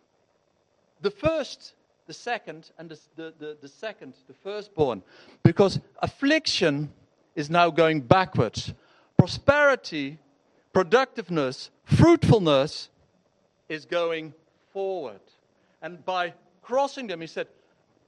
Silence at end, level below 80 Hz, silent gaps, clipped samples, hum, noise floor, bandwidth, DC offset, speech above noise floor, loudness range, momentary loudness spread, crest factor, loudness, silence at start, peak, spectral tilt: 0.65 s; -54 dBFS; none; under 0.1%; none; -68 dBFS; 11 kHz; under 0.1%; 44 dB; 11 LU; 21 LU; 22 dB; -24 LUFS; 1.05 s; -4 dBFS; -6 dB/octave